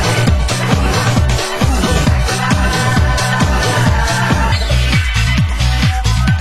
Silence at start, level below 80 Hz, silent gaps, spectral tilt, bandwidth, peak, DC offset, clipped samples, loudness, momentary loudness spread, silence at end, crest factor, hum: 0 s; -18 dBFS; none; -4.5 dB/octave; 16 kHz; 0 dBFS; 2%; under 0.1%; -14 LUFS; 1 LU; 0 s; 12 dB; none